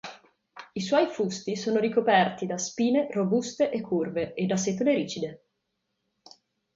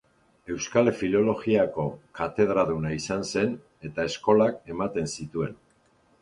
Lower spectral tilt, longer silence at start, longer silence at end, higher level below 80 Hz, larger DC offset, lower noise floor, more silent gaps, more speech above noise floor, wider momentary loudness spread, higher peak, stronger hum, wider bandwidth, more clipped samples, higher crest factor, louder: about the same, -5 dB/octave vs -5.5 dB/octave; second, 0.05 s vs 0.45 s; first, 1.4 s vs 0.65 s; second, -68 dBFS vs -54 dBFS; neither; first, -79 dBFS vs -63 dBFS; neither; first, 53 dB vs 38 dB; about the same, 10 LU vs 10 LU; about the same, -8 dBFS vs -6 dBFS; neither; second, 7.8 kHz vs 11 kHz; neither; about the same, 20 dB vs 20 dB; about the same, -27 LUFS vs -26 LUFS